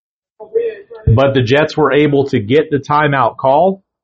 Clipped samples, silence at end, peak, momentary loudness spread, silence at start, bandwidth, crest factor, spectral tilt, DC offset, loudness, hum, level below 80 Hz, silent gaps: under 0.1%; 0.3 s; 0 dBFS; 8 LU; 0.4 s; 7.4 kHz; 14 dB; -5.5 dB/octave; under 0.1%; -13 LUFS; none; -36 dBFS; none